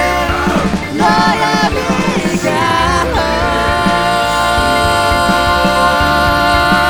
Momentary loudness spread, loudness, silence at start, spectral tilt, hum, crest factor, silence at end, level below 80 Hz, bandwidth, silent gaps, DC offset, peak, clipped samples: 3 LU; -12 LUFS; 0 s; -4.5 dB/octave; none; 12 dB; 0 s; -26 dBFS; over 20 kHz; none; under 0.1%; 0 dBFS; under 0.1%